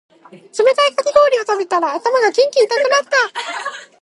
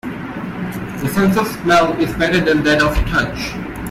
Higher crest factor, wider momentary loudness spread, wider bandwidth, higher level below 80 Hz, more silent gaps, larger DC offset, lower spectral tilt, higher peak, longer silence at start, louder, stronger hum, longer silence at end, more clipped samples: about the same, 16 dB vs 14 dB; about the same, 11 LU vs 12 LU; second, 11.5 kHz vs 16 kHz; second, -64 dBFS vs -30 dBFS; neither; neither; second, -0.5 dB/octave vs -5.5 dB/octave; first, 0 dBFS vs -4 dBFS; first, 0.35 s vs 0.05 s; about the same, -15 LUFS vs -17 LUFS; neither; first, 0.2 s vs 0 s; neither